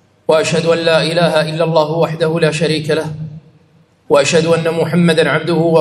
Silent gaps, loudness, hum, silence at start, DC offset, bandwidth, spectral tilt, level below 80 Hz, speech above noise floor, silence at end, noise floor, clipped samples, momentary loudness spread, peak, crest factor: none; -13 LUFS; none; 0.3 s; under 0.1%; 12.5 kHz; -5.5 dB/octave; -56 dBFS; 38 dB; 0 s; -51 dBFS; under 0.1%; 5 LU; 0 dBFS; 14 dB